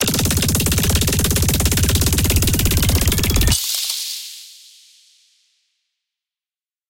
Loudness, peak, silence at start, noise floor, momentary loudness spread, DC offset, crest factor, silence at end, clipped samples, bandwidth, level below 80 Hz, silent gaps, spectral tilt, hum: -16 LUFS; 0 dBFS; 0 s; under -90 dBFS; 7 LU; under 0.1%; 18 dB; 2.35 s; under 0.1%; 17.5 kHz; -26 dBFS; none; -3.5 dB/octave; none